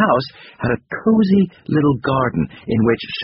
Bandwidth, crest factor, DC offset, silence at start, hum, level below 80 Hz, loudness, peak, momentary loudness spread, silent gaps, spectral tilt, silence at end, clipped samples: 5.8 kHz; 16 dB; under 0.1%; 0 s; none; -46 dBFS; -18 LUFS; -2 dBFS; 8 LU; none; -6 dB/octave; 0 s; under 0.1%